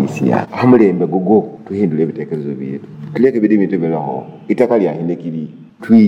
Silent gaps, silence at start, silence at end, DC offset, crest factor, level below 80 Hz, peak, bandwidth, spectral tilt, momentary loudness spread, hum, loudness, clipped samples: none; 0 s; 0 s; under 0.1%; 14 dB; -60 dBFS; 0 dBFS; 7.8 kHz; -9 dB/octave; 14 LU; none; -15 LUFS; under 0.1%